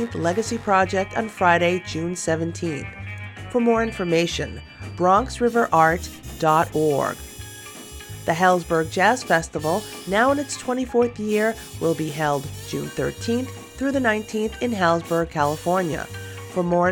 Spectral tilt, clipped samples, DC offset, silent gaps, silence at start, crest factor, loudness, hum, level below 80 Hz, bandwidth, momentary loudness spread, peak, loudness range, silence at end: -5 dB/octave; under 0.1%; under 0.1%; none; 0 s; 18 dB; -22 LUFS; none; -46 dBFS; 19 kHz; 15 LU; -4 dBFS; 3 LU; 0 s